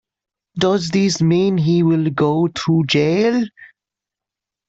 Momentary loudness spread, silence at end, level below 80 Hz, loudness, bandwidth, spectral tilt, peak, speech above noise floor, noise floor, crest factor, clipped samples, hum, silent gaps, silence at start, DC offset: 5 LU; 1 s; -56 dBFS; -17 LUFS; 8 kHz; -6 dB/octave; -4 dBFS; 70 dB; -86 dBFS; 14 dB; under 0.1%; none; none; 0.55 s; under 0.1%